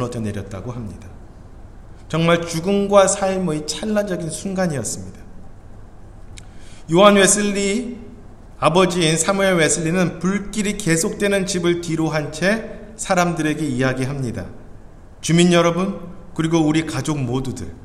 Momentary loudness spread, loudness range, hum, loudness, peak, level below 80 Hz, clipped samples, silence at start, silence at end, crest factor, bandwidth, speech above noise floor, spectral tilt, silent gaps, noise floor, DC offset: 16 LU; 5 LU; none; -18 LUFS; 0 dBFS; -42 dBFS; under 0.1%; 0 s; 0 s; 20 dB; 14 kHz; 21 dB; -4.5 dB/octave; none; -39 dBFS; under 0.1%